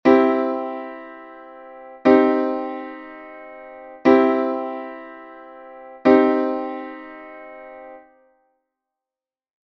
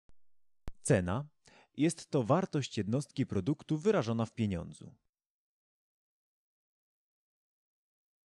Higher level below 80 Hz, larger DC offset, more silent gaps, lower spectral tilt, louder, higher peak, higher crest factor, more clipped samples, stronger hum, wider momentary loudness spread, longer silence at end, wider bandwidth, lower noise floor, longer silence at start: about the same, -64 dBFS vs -62 dBFS; neither; neither; about the same, -7 dB/octave vs -6.5 dB/octave; first, -19 LUFS vs -33 LUFS; first, 0 dBFS vs -16 dBFS; about the same, 20 dB vs 20 dB; neither; neither; first, 25 LU vs 11 LU; second, 1.65 s vs 3.35 s; second, 6.2 kHz vs 11.5 kHz; first, under -90 dBFS vs -65 dBFS; about the same, 0.05 s vs 0.1 s